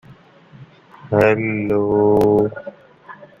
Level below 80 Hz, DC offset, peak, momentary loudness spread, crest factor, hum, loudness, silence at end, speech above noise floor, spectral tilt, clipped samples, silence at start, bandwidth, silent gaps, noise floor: -50 dBFS; under 0.1%; -2 dBFS; 12 LU; 18 dB; none; -17 LUFS; 0.15 s; 30 dB; -8.5 dB/octave; under 0.1%; 0.6 s; 14 kHz; none; -46 dBFS